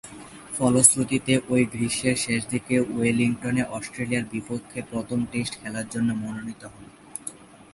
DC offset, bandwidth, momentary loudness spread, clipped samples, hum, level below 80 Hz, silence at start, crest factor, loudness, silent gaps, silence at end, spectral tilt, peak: under 0.1%; 11.5 kHz; 17 LU; under 0.1%; none; -56 dBFS; 0.05 s; 26 dB; -24 LUFS; none; 0.2 s; -4 dB/octave; 0 dBFS